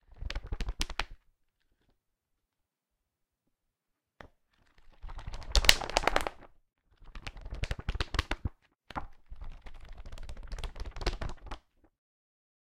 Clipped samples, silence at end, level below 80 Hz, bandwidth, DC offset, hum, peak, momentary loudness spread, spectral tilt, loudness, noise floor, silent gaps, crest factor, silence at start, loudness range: under 0.1%; 1.05 s; -40 dBFS; 16 kHz; under 0.1%; none; 0 dBFS; 24 LU; -2.5 dB/octave; -33 LUFS; -86 dBFS; none; 36 dB; 0.1 s; 13 LU